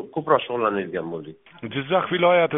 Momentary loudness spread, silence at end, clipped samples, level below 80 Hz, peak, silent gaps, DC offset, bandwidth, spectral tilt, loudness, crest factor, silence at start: 17 LU; 0 s; under 0.1%; -64 dBFS; -2 dBFS; none; under 0.1%; 3.9 kHz; -3.5 dB/octave; -23 LUFS; 20 dB; 0 s